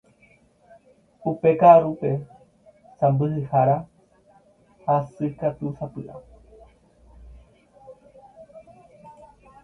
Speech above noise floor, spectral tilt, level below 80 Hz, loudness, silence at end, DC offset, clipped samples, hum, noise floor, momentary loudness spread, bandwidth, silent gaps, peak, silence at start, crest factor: 38 dB; -10.5 dB/octave; -56 dBFS; -21 LUFS; 0.55 s; under 0.1%; under 0.1%; none; -58 dBFS; 20 LU; 4 kHz; none; -2 dBFS; 1.25 s; 22 dB